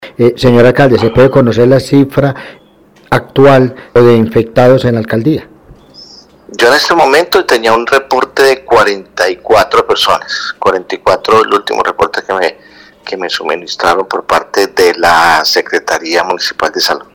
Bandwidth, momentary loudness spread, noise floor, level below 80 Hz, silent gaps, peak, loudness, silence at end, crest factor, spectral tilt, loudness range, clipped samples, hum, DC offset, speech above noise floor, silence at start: over 20 kHz; 8 LU; -43 dBFS; -40 dBFS; none; 0 dBFS; -9 LUFS; 0.15 s; 10 dB; -5 dB/octave; 4 LU; 0.5%; none; under 0.1%; 34 dB; 0 s